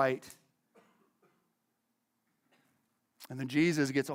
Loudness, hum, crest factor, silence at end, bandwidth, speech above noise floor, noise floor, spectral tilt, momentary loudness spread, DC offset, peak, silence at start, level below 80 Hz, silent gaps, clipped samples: -32 LUFS; none; 22 dB; 0 s; 16.5 kHz; 50 dB; -81 dBFS; -5.5 dB/octave; 18 LU; under 0.1%; -14 dBFS; 0 s; -78 dBFS; none; under 0.1%